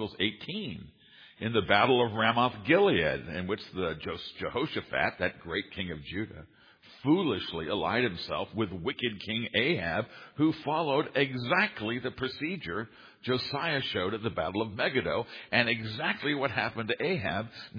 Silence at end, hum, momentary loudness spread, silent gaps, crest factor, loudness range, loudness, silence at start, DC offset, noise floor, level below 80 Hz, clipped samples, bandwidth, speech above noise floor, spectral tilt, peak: 0 s; none; 11 LU; none; 24 dB; 5 LU; -30 LUFS; 0 s; under 0.1%; -56 dBFS; -60 dBFS; under 0.1%; 5.2 kHz; 26 dB; -7.5 dB/octave; -6 dBFS